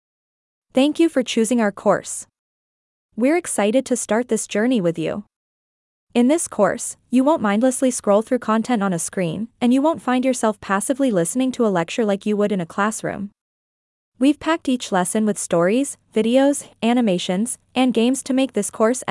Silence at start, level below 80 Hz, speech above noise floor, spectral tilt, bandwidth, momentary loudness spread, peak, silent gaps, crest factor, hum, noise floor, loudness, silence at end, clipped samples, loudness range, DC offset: 0.75 s; -62 dBFS; over 71 dB; -4.5 dB/octave; 12 kHz; 6 LU; -4 dBFS; 2.39-3.09 s, 5.36-6.07 s, 13.41-14.12 s; 16 dB; none; under -90 dBFS; -20 LUFS; 0 s; under 0.1%; 3 LU; under 0.1%